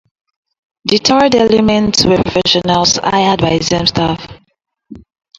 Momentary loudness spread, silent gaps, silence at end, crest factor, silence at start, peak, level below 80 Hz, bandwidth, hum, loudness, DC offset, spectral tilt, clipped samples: 6 LU; none; 0.4 s; 14 dB; 0.85 s; 0 dBFS; -38 dBFS; 11 kHz; none; -11 LUFS; under 0.1%; -4 dB/octave; under 0.1%